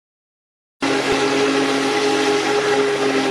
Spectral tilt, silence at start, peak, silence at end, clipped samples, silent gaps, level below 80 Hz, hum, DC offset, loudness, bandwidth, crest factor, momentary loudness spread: -3 dB/octave; 0.8 s; -6 dBFS; 0 s; under 0.1%; none; -56 dBFS; none; under 0.1%; -18 LUFS; 13 kHz; 14 dB; 2 LU